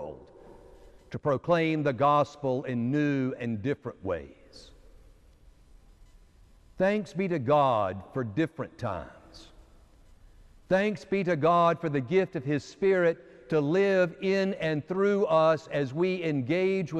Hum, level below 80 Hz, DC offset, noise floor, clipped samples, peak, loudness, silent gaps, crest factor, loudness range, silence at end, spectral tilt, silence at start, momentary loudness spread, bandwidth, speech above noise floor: none; -58 dBFS; under 0.1%; -57 dBFS; under 0.1%; -12 dBFS; -27 LUFS; none; 16 dB; 8 LU; 0 s; -7.5 dB/octave; 0 s; 11 LU; 9.2 kHz; 30 dB